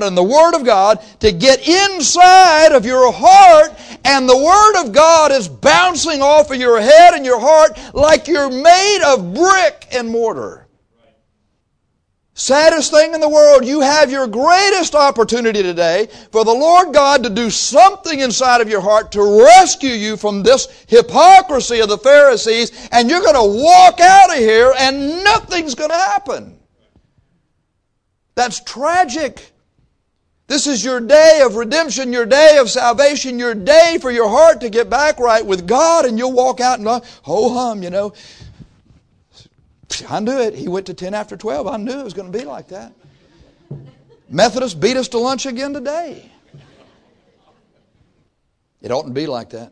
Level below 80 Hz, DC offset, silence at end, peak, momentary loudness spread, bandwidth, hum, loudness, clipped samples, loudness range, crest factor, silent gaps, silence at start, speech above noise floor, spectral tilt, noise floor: -44 dBFS; under 0.1%; 0.05 s; 0 dBFS; 16 LU; 11 kHz; none; -11 LUFS; 0.5%; 14 LU; 12 dB; none; 0 s; 56 dB; -2.5 dB/octave; -67 dBFS